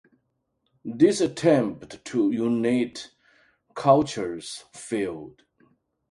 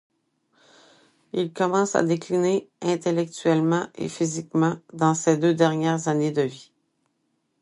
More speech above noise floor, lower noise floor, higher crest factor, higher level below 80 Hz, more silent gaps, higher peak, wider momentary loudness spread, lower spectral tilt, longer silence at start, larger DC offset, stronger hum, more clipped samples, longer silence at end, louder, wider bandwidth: about the same, 51 dB vs 50 dB; about the same, -75 dBFS vs -73 dBFS; about the same, 20 dB vs 20 dB; first, -64 dBFS vs -70 dBFS; neither; about the same, -6 dBFS vs -4 dBFS; first, 19 LU vs 7 LU; about the same, -5.5 dB/octave vs -6 dB/octave; second, 0.85 s vs 1.35 s; neither; neither; neither; second, 0.8 s vs 1 s; about the same, -24 LUFS vs -23 LUFS; about the same, 11.5 kHz vs 11.5 kHz